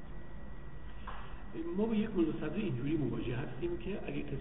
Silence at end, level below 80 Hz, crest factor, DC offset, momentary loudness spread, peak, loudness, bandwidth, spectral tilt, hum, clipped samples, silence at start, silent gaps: 0 s; -50 dBFS; 16 dB; 0.8%; 17 LU; -20 dBFS; -37 LUFS; 3.9 kHz; -6.5 dB/octave; none; under 0.1%; 0 s; none